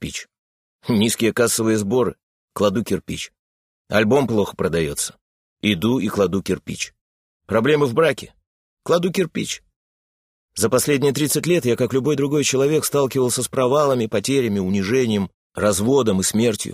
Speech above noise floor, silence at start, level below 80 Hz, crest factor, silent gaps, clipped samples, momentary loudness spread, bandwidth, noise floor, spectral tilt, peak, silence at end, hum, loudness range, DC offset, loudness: over 71 dB; 0 s; -52 dBFS; 20 dB; 0.39-0.79 s, 2.23-2.48 s, 3.39-3.85 s, 5.21-5.56 s, 7.01-7.40 s, 8.47-8.77 s, 9.76-10.49 s, 15.34-15.50 s; under 0.1%; 11 LU; 16 kHz; under -90 dBFS; -4.5 dB/octave; 0 dBFS; 0 s; none; 3 LU; under 0.1%; -20 LUFS